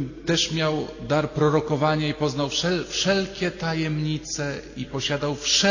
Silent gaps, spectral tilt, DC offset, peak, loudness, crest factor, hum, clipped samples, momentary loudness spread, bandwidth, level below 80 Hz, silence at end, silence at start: none; -4 dB/octave; under 0.1%; -8 dBFS; -24 LUFS; 16 dB; none; under 0.1%; 7 LU; 7.4 kHz; -48 dBFS; 0 s; 0 s